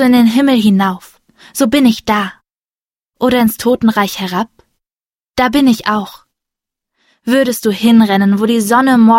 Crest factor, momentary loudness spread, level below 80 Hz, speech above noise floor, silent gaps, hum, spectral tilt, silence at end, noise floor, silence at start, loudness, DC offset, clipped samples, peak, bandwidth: 12 dB; 12 LU; -46 dBFS; over 79 dB; 2.82-2.89 s, 4.93-4.97 s, 5.15-5.19 s; none; -5 dB/octave; 0 s; under -90 dBFS; 0 s; -12 LUFS; under 0.1%; under 0.1%; 0 dBFS; 16.5 kHz